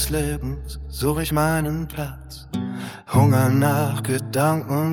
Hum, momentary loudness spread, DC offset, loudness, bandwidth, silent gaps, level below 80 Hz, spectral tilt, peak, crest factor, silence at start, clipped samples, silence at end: none; 14 LU; under 0.1%; -22 LUFS; 18.5 kHz; none; -36 dBFS; -6 dB/octave; -4 dBFS; 18 dB; 0 s; under 0.1%; 0 s